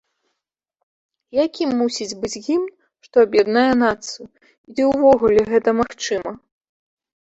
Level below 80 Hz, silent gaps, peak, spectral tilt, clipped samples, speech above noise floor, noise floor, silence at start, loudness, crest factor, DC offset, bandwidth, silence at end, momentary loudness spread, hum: -52 dBFS; 4.58-4.64 s; -2 dBFS; -4.5 dB/octave; under 0.1%; 63 dB; -80 dBFS; 1.35 s; -18 LUFS; 18 dB; under 0.1%; 8.2 kHz; 0.85 s; 14 LU; none